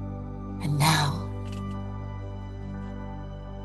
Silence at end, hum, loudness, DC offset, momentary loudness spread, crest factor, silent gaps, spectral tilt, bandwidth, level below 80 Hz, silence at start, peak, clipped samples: 0 s; 50 Hz at -45 dBFS; -30 LUFS; under 0.1%; 16 LU; 22 dB; none; -4.5 dB/octave; 12.5 kHz; -42 dBFS; 0 s; -8 dBFS; under 0.1%